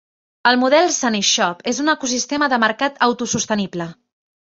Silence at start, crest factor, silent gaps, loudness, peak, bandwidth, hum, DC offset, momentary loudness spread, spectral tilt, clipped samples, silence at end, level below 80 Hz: 0.45 s; 18 dB; none; -17 LUFS; -2 dBFS; 8 kHz; none; under 0.1%; 7 LU; -2.5 dB/octave; under 0.1%; 0.5 s; -60 dBFS